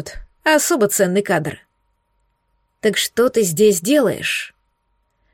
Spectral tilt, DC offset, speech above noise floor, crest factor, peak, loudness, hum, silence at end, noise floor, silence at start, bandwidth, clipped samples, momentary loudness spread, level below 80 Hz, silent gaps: -3.5 dB/octave; under 0.1%; 50 dB; 16 dB; -4 dBFS; -17 LUFS; none; 0.85 s; -67 dBFS; 0 s; 17 kHz; under 0.1%; 9 LU; -48 dBFS; none